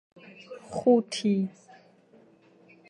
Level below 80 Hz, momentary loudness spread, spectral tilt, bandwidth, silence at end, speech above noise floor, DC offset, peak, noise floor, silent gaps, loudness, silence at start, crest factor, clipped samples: -72 dBFS; 22 LU; -6 dB/octave; 11 kHz; 1.4 s; 32 dB; under 0.1%; -10 dBFS; -58 dBFS; none; -26 LUFS; 0.5 s; 20 dB; under 0.1%